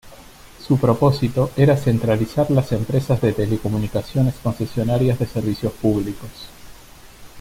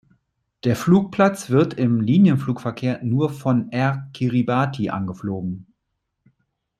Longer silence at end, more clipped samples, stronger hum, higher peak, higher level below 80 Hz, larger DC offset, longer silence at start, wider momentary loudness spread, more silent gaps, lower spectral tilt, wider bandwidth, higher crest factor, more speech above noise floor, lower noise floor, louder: second, 0 s vs 1.2 s; neither; neither; about the same, -4 dBFS vs -2 dBFS; first, -42 dBFS vs -58 dBFS; neither; second, 0.05 s vs 0.65 s; second, 8 LU vs 11 LU; neither; about the same, -8 dB/octave vs -7.5 dB/octave; about the same, 16 kHz vs 15 kHz; about the same, 16 dB vs 18 dB; second, 24 dB vs 57 dB; second, -43 dBFS vs -77 dBFS; about the same, -20 LUFS vs -21 LUFS